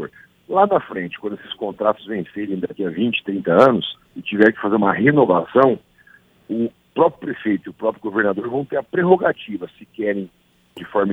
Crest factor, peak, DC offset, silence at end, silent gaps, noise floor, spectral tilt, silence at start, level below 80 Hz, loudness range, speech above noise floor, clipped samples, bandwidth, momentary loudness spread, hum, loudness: 20 dB; 0 dBFS; under 0.1%; 0 s; none; -52 dBFS; -8 dB/octave; 0 s; -60 dBFS; 5 LU; 33 dB; under 0.1%; 7.6 kHz; 13 LU; none; -19 LUFS